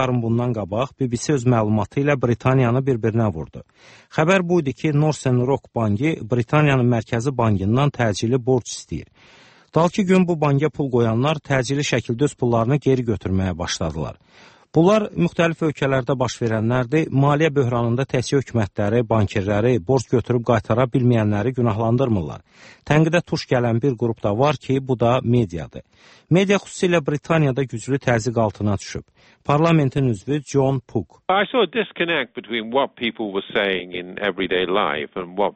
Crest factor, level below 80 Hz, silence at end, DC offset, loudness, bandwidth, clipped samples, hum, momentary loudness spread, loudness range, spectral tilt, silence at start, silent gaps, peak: 16 dB; -48 dBFS; 0.05 s; under 0.1%; -20 LUFS; 8.8 kHz; under 0.1%; none; 7 LU; 2 LU; -6.5 dB/octave; 0 s; none; -4 dBFS